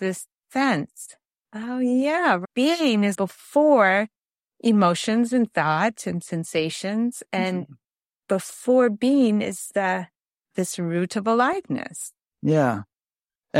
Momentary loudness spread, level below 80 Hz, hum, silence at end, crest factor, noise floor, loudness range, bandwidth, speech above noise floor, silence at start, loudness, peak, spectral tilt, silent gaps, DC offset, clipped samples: 14 LU; -70 dBFS; none; 0 s; 18 dB; under -90 dBFS; 4 LU; 15.5 kHz; over 68 dB; 0 s; -23 LUFS; -4 dBFS; -5 dB/octave; none; under 0.1%; under 0.1%